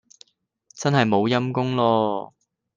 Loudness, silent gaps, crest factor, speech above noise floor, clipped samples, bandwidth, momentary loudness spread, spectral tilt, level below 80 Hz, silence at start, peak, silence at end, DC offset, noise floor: -22 LUFS; none; 18 dB; 39 dB; under 0.1%; 9.4 kHz; 9 LU; -6 dB/octave; -66 dBFS; 0.75 s; -4 dBFS; 0.5 s; under 0.1%; -60 dBFS